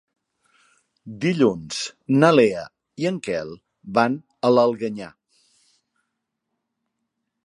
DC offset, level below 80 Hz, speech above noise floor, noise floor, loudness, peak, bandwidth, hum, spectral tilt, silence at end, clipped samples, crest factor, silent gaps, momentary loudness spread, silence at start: under 0.1%; -64 dBFS; 59 dB; -79 dBFS; -21 LUFS; 0 dBFS; 11.5 kHz; none; -6 dB/octave; 2.35 s; under 0.1%; 22 dB; none; 21 LU; 1.05 s